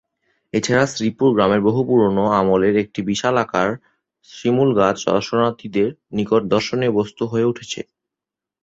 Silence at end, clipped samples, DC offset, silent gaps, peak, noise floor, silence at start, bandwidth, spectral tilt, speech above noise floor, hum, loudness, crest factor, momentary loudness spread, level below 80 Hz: 0.8 s; under 0.1%; under 0.1%; none; -2 dBFS; -86 dBFS; 0.55 s; 8 kHz; -5.5 dB/octave; 68 dB; none; -18 LUFS; 16 dB; 9 LU; -52 dBFS